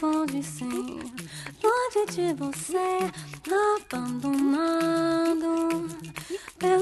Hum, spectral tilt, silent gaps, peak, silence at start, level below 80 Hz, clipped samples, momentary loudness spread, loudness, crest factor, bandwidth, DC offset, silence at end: none; -5 dB/octave; none; -10 dBFS; 0 s; -62 dBFS; under 0.1%; 12 LU; -27 LUFS; 16 dB; 13 kHz; under 0.1%; 0 s